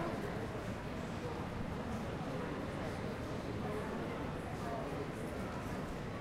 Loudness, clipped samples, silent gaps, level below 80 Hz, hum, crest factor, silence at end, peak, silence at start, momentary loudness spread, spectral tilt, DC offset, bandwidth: -42 LUFS; under 0.1%; none; -52 dBFS; none; 14 dB; 0 s; -28 dBFS; 0 s; 2 LU; -6.5 dB/octave; under 0.1%; 16 kHz